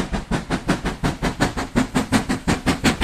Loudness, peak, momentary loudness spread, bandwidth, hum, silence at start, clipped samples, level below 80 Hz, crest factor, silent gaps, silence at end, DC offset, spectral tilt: -22 LUFS; -4 dBFS; 5 LU; 15.5 kHz; none; 0 s; under 0.1%; -32 dBFS; 18 dB; none; 0 s; under 0.1%; -5 dB/octave